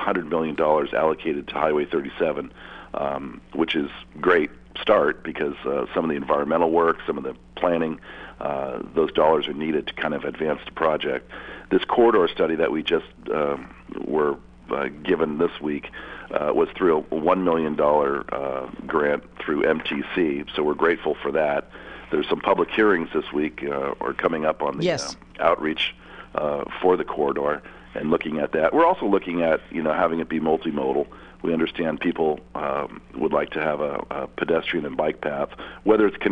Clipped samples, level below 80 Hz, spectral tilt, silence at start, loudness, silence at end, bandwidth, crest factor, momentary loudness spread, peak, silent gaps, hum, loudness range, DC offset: under 0.1%; -52 dBFS; -6 dB/octave; 0 s; -23 LUFS; 0 s; 9.6 kHz; 20 dB; 11 LU; -4 dBFS; none; none; 3 LU; under 0.1%